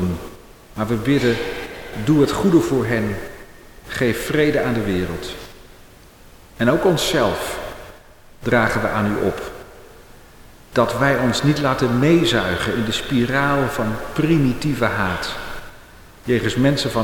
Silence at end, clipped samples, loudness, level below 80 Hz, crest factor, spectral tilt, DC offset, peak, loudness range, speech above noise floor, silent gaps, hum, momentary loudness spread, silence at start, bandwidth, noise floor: 0 s; under 0.1%; -19 LUFS; -40 dBFS; 16 dB; -5.5 dB/octave; under 0.1%; -4 dBFS; 4 LU; 27 dB; none; none; 14 LU; 0 s; 19 kHz; -45 dBFS